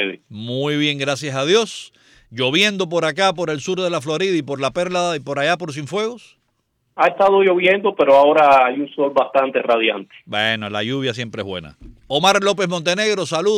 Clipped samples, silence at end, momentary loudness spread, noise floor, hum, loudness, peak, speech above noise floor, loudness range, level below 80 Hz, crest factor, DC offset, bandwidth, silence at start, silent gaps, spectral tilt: under 0.1%; 0 s; 13 LU; -68 dBFS; none; -18 LUFS; -4 dBFS; 50 dB; 6 LU; -56 dBFS; 14 dB; under 0.1%; 15 kHz; 0 s; none; -4 dB/octave